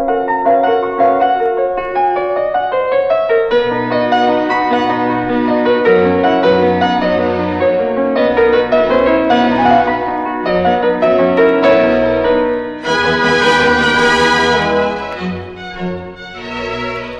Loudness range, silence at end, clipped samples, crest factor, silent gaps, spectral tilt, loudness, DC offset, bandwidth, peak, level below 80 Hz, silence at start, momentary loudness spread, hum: 2 LU; 0 s; under 0.1%; 12 dB; none; -5.5 dB/octave; -13 LUFS; under 0.1%; 10.5 kHz; -2 dBFS; -42 dBFS; 0 s; 10 LU; none